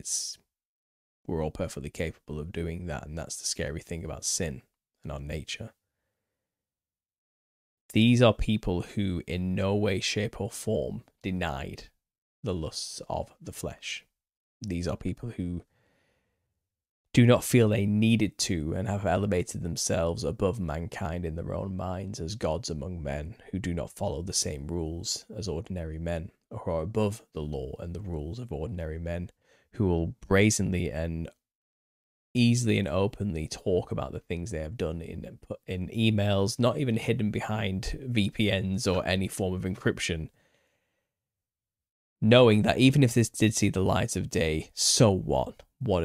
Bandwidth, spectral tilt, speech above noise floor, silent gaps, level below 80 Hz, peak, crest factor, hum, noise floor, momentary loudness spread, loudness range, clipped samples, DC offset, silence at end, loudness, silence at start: 15.5 kHz; -5 dB/octave; over 62 dB; 0.65-1.25 s, 7.18-7.89 s, 12.18-12.43 s, 14.37-14.60 s, 16.89-17.05 s, 31.55-32.35 s, 41.91-42.16 s; -46 dBFS; -6 dBFS; 24 dB; none; under -90 dBFS; 15 LU; 11 LU; under 0.1%; under 0.1%; 0 s; -29 LUFS; 0.05 s